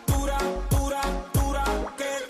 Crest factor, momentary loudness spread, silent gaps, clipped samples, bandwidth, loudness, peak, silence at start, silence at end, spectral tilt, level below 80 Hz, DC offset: 12 dB; 4 LU; none; under 0.1%; 14.5 kHz; -27 LUFS; -14 dBFS; 0 s; 0 s; -5 dB/octave; -30 dBFS; under 0.1%